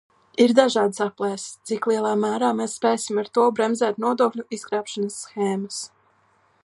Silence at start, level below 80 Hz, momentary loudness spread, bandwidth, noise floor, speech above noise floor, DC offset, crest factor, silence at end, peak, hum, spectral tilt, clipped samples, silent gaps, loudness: 0.4 s; -74 dBFS; 12 LU; 11.5 kHz; -62 dBFS; 40 dB; under 0.1%; 20 dB; 0.8 s; -2 dBFS; none; -4 dB/octave; under 0.1%; none; -23 LUFS